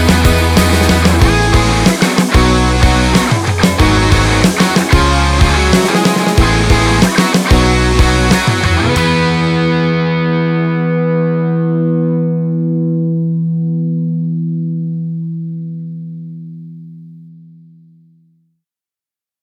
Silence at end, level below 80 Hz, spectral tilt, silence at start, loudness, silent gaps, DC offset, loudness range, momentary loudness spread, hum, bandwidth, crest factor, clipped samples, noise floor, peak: 2.1 s; -20 dBFS; -5.5 dB/octave; 0 s; -12 LUFS; none; under 0.1%; 12 LU; 10 LU; none; 16.5 kHz; 12 dB; under 0.1%; -88 dBFS; 0 dBFS